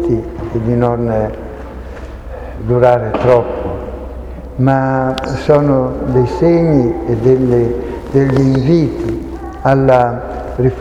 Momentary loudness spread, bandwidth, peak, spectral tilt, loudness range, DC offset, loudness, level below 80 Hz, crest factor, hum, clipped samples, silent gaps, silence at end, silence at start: 17 LU; 8.6 kHz; 0 dBFS; -9 dB/octave; 3 LU; under 0.1%; -14 LUFS; -30 dBFS; 14 dB; none; 0.1%; none; 0 s; 0 s